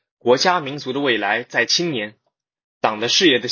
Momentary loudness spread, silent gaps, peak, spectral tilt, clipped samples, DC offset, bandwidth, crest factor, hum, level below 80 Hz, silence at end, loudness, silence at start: 10 LU; 2.64-2.81 s; 0 dBFS; -3 dB/octave; under 0.1%; under 0.1%; 7.2 kHz; 20 dB; none; -68 dBFS; 0 s; -18 LUFS; 0.25 s